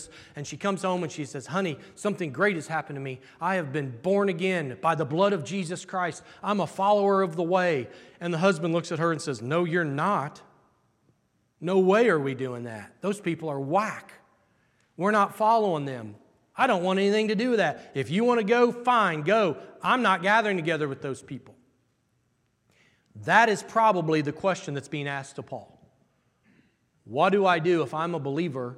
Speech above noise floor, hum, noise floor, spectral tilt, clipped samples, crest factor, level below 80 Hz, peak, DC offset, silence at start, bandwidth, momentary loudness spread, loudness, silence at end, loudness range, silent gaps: 45 dB; none; -71 dBFS; -5.5 dB/octave; under 0.1%; 22 dB; -74 dBFS; -6 dBFS; under 0.1%; 0 s; 13 kHz; 14 LU; -26 LUFS; 0 s; 5 LU; none